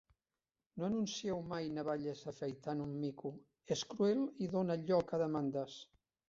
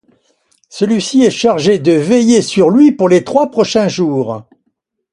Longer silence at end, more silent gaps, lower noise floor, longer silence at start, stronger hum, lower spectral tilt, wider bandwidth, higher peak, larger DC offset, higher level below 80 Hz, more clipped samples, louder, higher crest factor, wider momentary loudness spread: second, 0.45 s vs 0.7 s; neither; first, under -90 dBFS vs -67 dBFS; about the same, 0.75 s vs 0.75 s; neither; about the same, -6 dB/octave vs -5.5 dB/octave; second, 7.6 kHz vs 11.5 kHz; second, -22 dBFS vs 0 dBFS; neither; second, -72 dBFS vs -54 dBFS; neither; second, -39 LUFS vs -11 LUFS; first, 18 dB vs 12 dB; first, 12 LU vs 8 LU